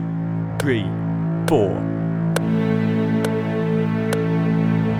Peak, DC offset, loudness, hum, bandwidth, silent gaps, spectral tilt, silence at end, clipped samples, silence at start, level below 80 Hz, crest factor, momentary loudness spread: -4 dBFS; under 0.1%; -21 LUFS; none; 14.5 kHz; none; -7.5 dB/octave; 0 s; under 0.1%; 0 s; -48 dBFS; 16 dB; 4 LU